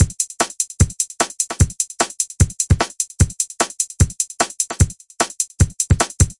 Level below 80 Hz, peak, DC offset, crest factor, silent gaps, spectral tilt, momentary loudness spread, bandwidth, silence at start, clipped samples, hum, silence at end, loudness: -28 dBFS; 0 dBFS; under 0.1%; 18 dB; none; -4 dB/octave; 3 LU; 11.5 kHz; 0 s; under 0.1%; none; 0.05 s; -19 LUFS